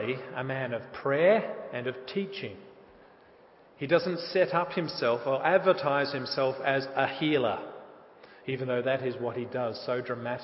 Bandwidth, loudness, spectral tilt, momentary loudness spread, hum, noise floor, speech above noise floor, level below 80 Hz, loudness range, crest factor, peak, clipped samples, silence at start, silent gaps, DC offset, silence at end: 5.8 kHz; -29 LUFS; -9 dB/octave; 12 LU; none; -57 dBFS; 28 dB; -72 dBFS; 4 LU; 20 dB; -10 dBFS; under 0.1%; 0 s; none; under 0.1%; 0 s